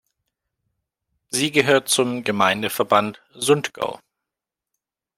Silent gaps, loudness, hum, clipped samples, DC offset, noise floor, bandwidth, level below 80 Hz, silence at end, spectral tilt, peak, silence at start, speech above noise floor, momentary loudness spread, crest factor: none; -20 LUFS; none; under 0.1%; under 0.1%; -87 dBFS; 16.5 kHz; -66 dBFS; 1.2 s; -3 dB/octave; -2 dBFS; 1.3 s; 66 dB; 10 LU; 20 dB